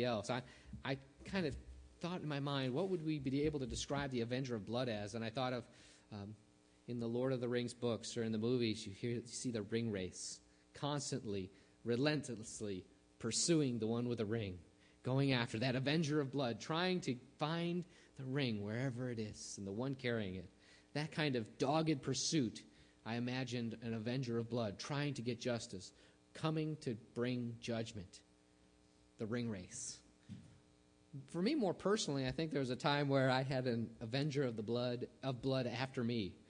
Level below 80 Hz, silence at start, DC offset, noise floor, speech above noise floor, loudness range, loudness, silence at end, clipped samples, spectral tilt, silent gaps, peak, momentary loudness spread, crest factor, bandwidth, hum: -68 dBFS; 0 s; under 0.1%; -70 dBFS; 30 dB; 6 LU; -40 LUFS; 0.1 s; under 0.1%; -5 dB/octave; none; -20 dBFS; 13 LU; 20 dB; 10.5 kHz; none